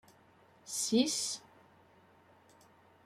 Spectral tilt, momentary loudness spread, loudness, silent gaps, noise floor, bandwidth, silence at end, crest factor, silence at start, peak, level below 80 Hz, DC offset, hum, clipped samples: -2.5 dB/octave; 14 LU; -33 LUFS; none; -64 dBFS; 16 kHz; 1.65 s; 24 dB; 0.65 s; -16 dBFS; -82 dBFS; under 0.1%; none; under 0.1%